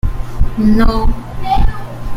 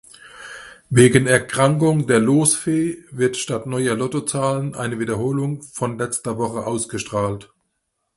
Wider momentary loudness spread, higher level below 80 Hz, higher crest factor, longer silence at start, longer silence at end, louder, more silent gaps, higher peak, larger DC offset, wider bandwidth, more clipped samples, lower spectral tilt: about the same, 11 LU vs 12 LU; first, -16 dBFS vs -52 dBFS; second, 10 dB vs 20 dB; second, 0.05 s vs 0.25 s; second, 0 s vs 0.75 s; first, -16 LUFS vs -19 LUFS; neither; about the same, 0 dBFS vs 0 dBFS; neither; second, 9.4 kHz vs 12 kHz; neither; first, -7.5 dB/octave vs -5 dB/octave